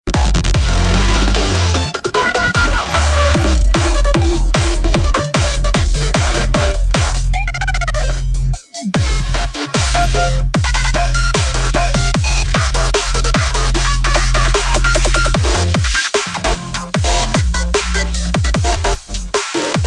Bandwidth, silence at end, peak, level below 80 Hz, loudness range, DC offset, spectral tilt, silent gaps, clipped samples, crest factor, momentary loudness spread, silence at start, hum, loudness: 11 kHz; 0 s; 0 dBFS; -16 dBFS; 3 LU; under 0.1%; -4 dB/octave; none; under 0.1%; 14 dB; 5 LU; 0.05 s; none; -16 LUFS